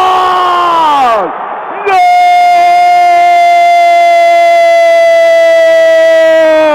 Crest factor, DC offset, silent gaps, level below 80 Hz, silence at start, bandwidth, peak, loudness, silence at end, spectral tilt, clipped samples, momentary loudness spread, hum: 4 dB; under 0.1%; none; -50 dBFS; 0 s; 14 kHz; -2 dBFS; -6 LUFS; 0 s; -2 dB/octave; under 0.1%; 4 LU; none